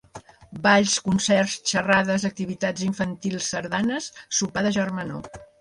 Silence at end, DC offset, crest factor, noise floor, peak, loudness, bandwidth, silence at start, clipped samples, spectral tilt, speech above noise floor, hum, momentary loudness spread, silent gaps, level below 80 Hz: 0.15 s; under 0.1%; 20 dB; -46 dBFS; -4 dBFS; -23 LUFS; 11.5 kHz; 0.15 s; under 0.1%; -3.5 dB/octave; 22 dB; none; 12 LU; none; -56 dBFS